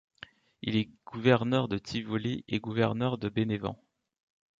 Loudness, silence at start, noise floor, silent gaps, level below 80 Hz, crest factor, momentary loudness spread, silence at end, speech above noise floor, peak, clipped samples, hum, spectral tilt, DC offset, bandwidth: -31 LUFS; 0.65 s; -54 dBFS; none; -60 dBFS; 20 dB; 16 LU; 0.85 s; 24 dB; -10 dBFS; under 0.1%; none; -7 dB/octave; under 0.1%; 7.6 kHz